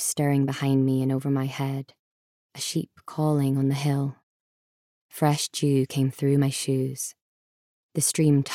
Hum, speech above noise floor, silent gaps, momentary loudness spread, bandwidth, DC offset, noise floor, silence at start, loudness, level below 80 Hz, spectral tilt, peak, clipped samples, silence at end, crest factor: none; over 66 dB; 1.99-2.49 s, 4.23-5.09 s, 7.21-7.89 s; 11 LU; 16 kHz; under 0.1%; under -90 dBFS; 0 s; -25 LUFS; -72 dBFS; -5.5 dB/octave; -8 dBFS; under 0.1%; 0 s; 18 dB